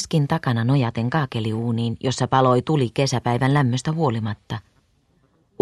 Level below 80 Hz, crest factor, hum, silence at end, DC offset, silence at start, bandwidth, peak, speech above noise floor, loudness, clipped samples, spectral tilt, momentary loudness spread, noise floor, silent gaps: -54 dBFS; 18 dB; none; 1 s; under 0.1%; 0 s; 12 kHz; -4 dBFS; 42 dB; -21 LUFS; under 0.1%; -6.5 dB/octave; 8 LU; -62 dBFS; none